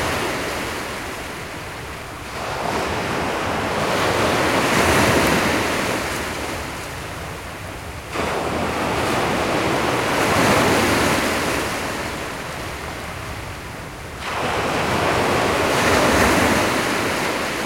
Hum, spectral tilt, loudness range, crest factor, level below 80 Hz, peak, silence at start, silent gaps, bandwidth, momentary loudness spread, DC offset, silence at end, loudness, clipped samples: none; -4 dB/octave; 7 LU; 18 dB; -40 dBFS; -4 dBFS; 0 s; none; 16.5 kHz; 15 LU; 0.1%; 0 s; -20 LUFS; under 0.1%